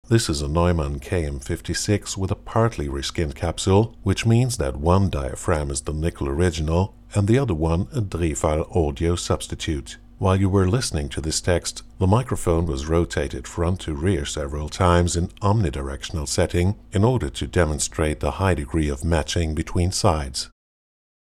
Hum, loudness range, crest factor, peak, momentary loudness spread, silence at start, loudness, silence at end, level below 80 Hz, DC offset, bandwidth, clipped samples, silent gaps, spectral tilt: none; 2 LU; 18 dB; -4 dBFS; 7 LU; 0.1 s; -23 LUFS; 0.8 s; -32 dBFS; under 0.1%; 14 kHz; under 0.1%; none; -5.5 dB/octave